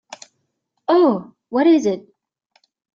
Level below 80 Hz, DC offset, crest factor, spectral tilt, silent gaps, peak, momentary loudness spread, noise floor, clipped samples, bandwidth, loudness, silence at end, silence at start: -70 dBFS; under 0.1%; 16 dB; -6 dB/octave; none; -4 dBFS; 19 LU; -73 dBFS; under 0.1%; 7.6 kHz; -17 LUFS; 0.95 s; 0.9 s